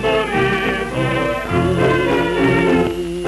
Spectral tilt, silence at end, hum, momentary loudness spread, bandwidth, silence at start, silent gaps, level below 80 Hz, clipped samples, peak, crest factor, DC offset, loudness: -6.5 dB/octave; 0 s; none; 5 LU; 13.5 kHz; 0 s; none; -36 dBFS; under 0.1%; -4 dBFS; 14 dB; under 0.1%; -17 LUFS